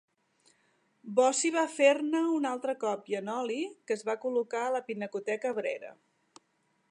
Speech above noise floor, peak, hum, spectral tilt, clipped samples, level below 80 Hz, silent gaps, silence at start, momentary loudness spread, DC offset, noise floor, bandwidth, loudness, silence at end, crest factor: 44 dB; -10 dBFS; none; -3 dB/octave; under 0.1%; -90 dBFS; none; 1.05 s; 10 LU; under 0.1%; -74 dBFS; 11 kHz; -30 LUFS; 1 s; 20 dB